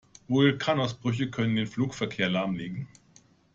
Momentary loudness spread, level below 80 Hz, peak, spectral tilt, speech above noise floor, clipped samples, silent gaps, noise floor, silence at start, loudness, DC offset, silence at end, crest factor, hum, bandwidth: 11 LU; -62 dBFS; -10 dBFS; -6 dB/octave; 33 dB; under 0.1%; none; -60 dBFS; 0.3 s; -28 LUFS; under 0.1%; 0.7 s; 18 dB; none; 7.8 kHz